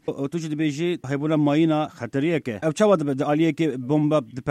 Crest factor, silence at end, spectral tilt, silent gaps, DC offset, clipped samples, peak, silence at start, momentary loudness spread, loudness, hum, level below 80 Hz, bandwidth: 16 dB; 0 s; -7 dB/octave; none; under 0.1%; under 0.1%; -6 dBFS; 0.05 s; 7 LU; -23 LUFS; none; -62 dBFS; 11 kHz